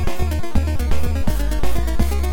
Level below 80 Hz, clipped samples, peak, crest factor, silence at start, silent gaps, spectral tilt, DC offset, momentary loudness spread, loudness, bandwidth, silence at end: -20 dBFS; under 0.1%; -4 dBFS; 12 dB; 0 s; none; -6 dB/octave; under 0.1%; 2 LU; -23 LUFS; 17 kHz; 0 s